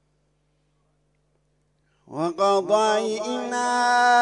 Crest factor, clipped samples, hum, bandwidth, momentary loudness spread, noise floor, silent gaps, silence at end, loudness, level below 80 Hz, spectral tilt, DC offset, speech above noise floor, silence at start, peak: 16 dB; under 0.1%; 50 Hz at -65 dBFS; 11 kHz; 10 LU; -68 dBFS; none; 0 s; -22 LUFS; -72 dBFS; -3 dB/octave; under 0.1%; 47 dB; 2.1 s; -8 dBFS